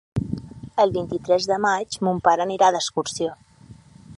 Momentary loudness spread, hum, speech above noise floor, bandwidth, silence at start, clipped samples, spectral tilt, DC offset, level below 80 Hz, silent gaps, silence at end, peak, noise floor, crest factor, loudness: 10 LU; none; 26 dB; 11.5 kHz; 0.15 s; under 0.1%; -4.5 dB/octave; under 0.1%; -50 dBFS; none; 0.05 s; -4 dBFS; -47 dBFS; 20 dB; -22 LUFS